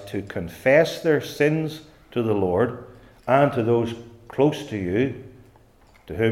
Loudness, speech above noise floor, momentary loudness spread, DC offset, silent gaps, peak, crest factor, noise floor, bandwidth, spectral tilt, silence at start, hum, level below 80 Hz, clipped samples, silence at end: -23 LUFS; 32 dB; 17 LU; under 0.1%; none; -4 dBFS; 20 dB; -54 dBFS; 16 kHz; -7 dB/octave; 0 s; none; -56 dBFS; under 0.1%; 0 s